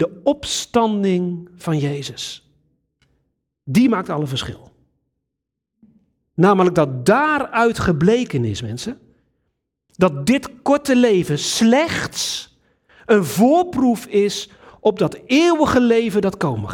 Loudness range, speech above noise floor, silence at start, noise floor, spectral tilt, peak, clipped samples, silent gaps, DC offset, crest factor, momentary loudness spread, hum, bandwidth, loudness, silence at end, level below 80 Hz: 6 LU; 63 dB; 0 s; -80 dBFS; -5.5 dB/octave; -2 dBFS; under 0.1%; none; under 0.1%; 16 dB; 13 LU; none; 17.5 kHz; -18 LUFS; 0 s; -50 dBFS